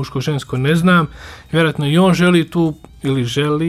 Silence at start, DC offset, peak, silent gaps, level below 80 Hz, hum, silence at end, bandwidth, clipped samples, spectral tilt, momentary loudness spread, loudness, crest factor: 0 s; under 0.1%; -2 dBFS; none; -44 dBFS; none; 0 s; 13.5 kHz; under 0.1%; -6.5 dB/octave; 9 LU; -16 LUFS; 12 dB